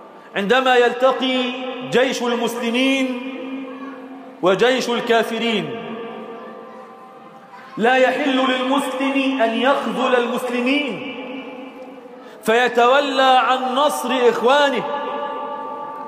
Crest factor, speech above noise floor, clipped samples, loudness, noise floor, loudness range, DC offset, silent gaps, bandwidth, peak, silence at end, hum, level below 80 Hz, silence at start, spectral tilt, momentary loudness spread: 16 dB; 24 dB; under 0.1%; -18 LUFS; -41 dBFS; 5 LU; under 0.1%; none; 15.5 kHz; -4 dBFS; 0 s; none; -72 dBFS; 0 s; -4 dB/octave; 19 LU